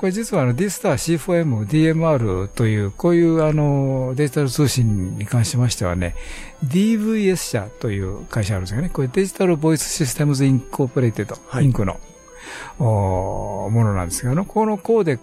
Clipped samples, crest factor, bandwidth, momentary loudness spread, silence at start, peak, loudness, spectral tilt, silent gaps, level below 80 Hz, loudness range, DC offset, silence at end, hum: under 0.1%; 12 dB; 15.5 kHz; 9 LU; 0 s; -6 dBFS; -20 LUFS; -6 dB/octave; none; -38 dBFS; 3 LU; under 0.1%; 0.05 s; none